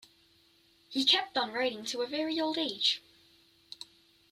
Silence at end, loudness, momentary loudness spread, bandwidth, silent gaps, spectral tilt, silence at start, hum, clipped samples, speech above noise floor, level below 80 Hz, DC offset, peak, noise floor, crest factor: 0.5 s; -30 LUFS; 22 LU; 15.5 kHz; none; -1.5 dB/octave; 0.9 s; none; under 0.1%; 34 dB; -78 dBFS; under 0.1%; -12 dBFS; -66 dBFS; 22 dB